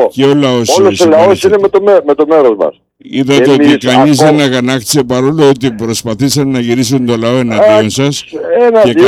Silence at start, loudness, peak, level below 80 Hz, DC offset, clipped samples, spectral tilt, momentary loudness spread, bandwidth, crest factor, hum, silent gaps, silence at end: 0 s; -8 LUFS; 0 dBFS; -48 dBFS; under 0.1%; 0.1%; -5 dB/octave; 7 LU; 16 kHz; 8 dB; none; none; 0 s